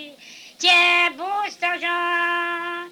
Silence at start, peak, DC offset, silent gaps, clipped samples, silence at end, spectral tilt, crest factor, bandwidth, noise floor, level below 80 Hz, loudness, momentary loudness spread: 0 s; -6 dBFS; under 0.1%; none; under 0.1%; 0 s; 0 dB/octave; 16 dB; 17.5 kHz; -44 dBFS; -76 dBFS; -19 LUFS; 12 LU